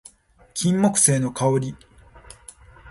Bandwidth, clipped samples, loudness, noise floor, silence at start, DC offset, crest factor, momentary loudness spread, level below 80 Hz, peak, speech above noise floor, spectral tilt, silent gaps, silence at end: 12 kHz; under 0.1%; -20 LUFS; -52 dBFS; 0.55 s; under 0.1%; 22 dB; 14 LU; -54 dBFS; -2 dBFS; 32 dB; -4.5 dB/octave; none; 0 s